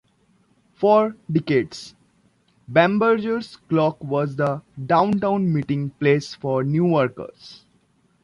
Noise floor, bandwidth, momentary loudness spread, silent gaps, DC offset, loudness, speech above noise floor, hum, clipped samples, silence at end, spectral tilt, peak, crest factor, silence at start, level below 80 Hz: -62 dBFS; 11 kHz; 10 LU; none; under 0.1%; -21 LUFS; 41 dB; none; under 0.1%; 0.65 s; -7.5 dB/octave; -4 dBFS; 18 dB; 0.8 s; -60 dBFS